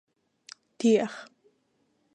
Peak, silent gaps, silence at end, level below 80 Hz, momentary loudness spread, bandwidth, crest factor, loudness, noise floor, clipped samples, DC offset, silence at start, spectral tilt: -12 dBFS; none; 0.9 s; -82 dBFS; 25 LU; 9.8 kHz; 20 dB; -26 LUFS; -72 dBFS; under 0.1%; under 0.1%; 0.8 s; -5 dB/octave